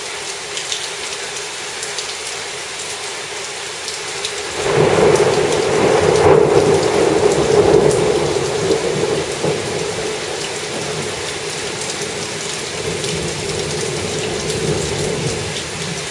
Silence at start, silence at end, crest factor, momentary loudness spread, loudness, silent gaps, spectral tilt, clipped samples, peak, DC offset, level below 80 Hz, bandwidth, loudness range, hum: 0 s; 0 s; 18 dB; 11 LU; -18 LUFS; none; -3.5 dB/octave; under 0.1%; 0 dBFS; under 0.1%; -44 dBFS; 11.5 kHz; 9 LU; none